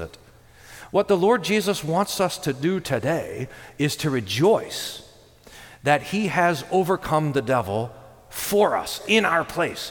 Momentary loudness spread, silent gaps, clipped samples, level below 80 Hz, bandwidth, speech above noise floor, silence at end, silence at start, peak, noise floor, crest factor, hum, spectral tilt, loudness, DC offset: 12 LU; none; under 0.1%; -54 dBFS; 19 kHz; 28 dB; 0 s; 0 s; -4 dBFS; -50 dBFS; 20 dB; none; -4.5 dB/octave; -23 LUFS; under 0.1%